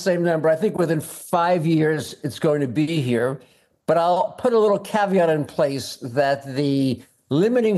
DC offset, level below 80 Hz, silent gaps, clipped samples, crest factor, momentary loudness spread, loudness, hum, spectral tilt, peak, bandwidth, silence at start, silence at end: under 0.1%; -66 dBFS; none; under 0.1%; 16 dB; 7 LU; -21 LUFS; none; -6.5 dB/octave; -6 dBFS; 12.5 kHz; 0 s; 0 s